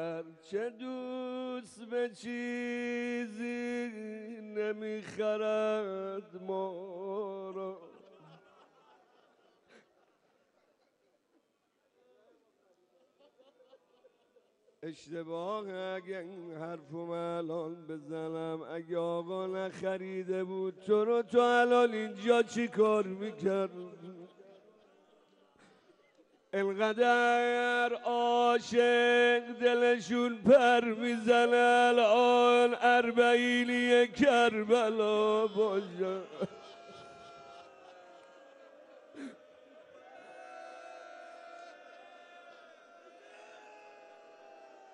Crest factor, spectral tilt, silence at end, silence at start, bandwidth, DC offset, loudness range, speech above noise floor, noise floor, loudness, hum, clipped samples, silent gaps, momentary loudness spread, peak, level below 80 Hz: 20 dB; -4.5 dB/octave; 0.3 s; 0 s; 10.5 kHz; under 0.1%; 24 LU; 46 dB; -77 dBFS; -30 LUFS; none; under 0.1%; none; 23 LU; -12 dBFS; -78 dBFS